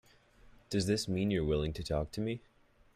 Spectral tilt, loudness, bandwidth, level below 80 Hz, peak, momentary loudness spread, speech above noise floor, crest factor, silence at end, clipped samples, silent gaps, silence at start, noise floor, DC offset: -6 dB/octave; -34 LUFS; 15 kHz; -50 dBFS; -18 dBFS; 6 LU; 28 dB; 16 dB; 0.55 s; under 0.1%; none; 0.7 s; -61 dBFS; under 0.1%